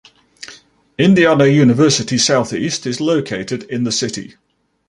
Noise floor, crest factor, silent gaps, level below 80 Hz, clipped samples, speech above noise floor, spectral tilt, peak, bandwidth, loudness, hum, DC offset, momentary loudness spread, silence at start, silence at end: -44 dBFS; 14 dB; none; -54 dBFS; under 0.1%; 29 dB; -4.5 dB/octave; -2 dBFS; 11.5 kHz; -14 LUFS; none; under 0.1%; 23 LU; 0.4 s; 0.65 s